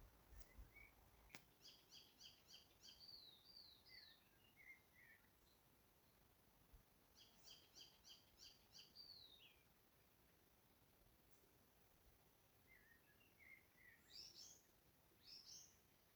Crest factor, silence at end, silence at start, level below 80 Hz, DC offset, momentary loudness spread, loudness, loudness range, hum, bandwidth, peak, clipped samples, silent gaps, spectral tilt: 36 dB; 0 s; 0 s; -78 dBFS; under 0.1%; 7 LU; -64 LUFS; 4 LU; none; over 20 kHz; -34 dBFS; under 0.1%; none; -1.5 dB/octave